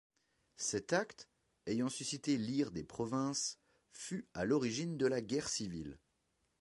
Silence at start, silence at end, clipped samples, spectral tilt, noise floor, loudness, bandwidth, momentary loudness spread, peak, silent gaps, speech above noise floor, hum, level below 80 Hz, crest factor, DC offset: 0.6 s; 0.65 s; under 0.1%; -4 dB/octave; -81 dBFS; -38 LUFS; 11.5 kHz; 14 LU; -20 dBFS; none; 43 dB; none; -68 dBFS; 20 dB; under 0.1%